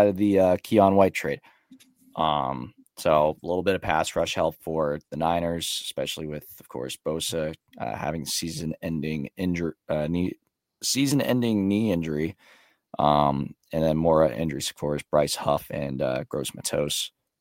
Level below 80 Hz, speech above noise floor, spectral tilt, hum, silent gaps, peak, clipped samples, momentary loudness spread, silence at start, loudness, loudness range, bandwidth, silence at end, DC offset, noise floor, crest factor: -52 dBFS; 30 dB; -5 dB/octave; none; none; -4 dBFS; under 0.1%; 12 LU; 0 s; -26 LUFS; 5 LU; 17 kHz; 0.3 s; under 0.1%; -55 dBFS; 22 dB